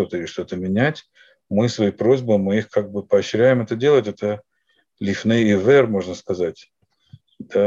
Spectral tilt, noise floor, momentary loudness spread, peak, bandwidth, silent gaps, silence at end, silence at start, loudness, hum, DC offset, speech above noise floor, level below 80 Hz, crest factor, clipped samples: -6.5 dB/octave; -66 dBFS; 11 LU; -4 dBFS; 7.8 kHz; none; 0 s; 0 s; -20 LUFS; none; under 0.1%; 47 dB; -62 dBFS; 16 dB; under 0.1%